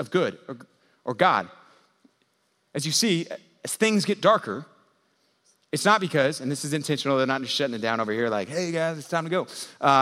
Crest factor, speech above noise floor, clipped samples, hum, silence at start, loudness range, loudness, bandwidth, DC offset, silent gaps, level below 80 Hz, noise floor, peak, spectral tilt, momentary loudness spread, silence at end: 22 dB; 46 dB; under 0.1%; none; 0 s; 2 LU; -25 LUFS; 16 kHz; under 0.1%; none; -78 dBFS; -70 dBFS; -4 dBFS; -4 dB/octave; 15 LU; 0 s